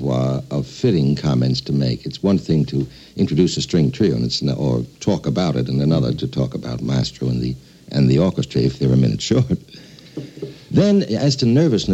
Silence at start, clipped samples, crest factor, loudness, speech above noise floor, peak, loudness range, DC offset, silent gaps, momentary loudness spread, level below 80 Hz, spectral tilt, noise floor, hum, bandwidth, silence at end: 0 s; under 0.1%; 16 dB; -19 LUFS; 24 dB; -2 dBFS; 2 LU; under 0.1%; none; 10 LU; -42 dBFS; -7 dB/octave; -41 dBFS; none; 8.2 kHz; 0 s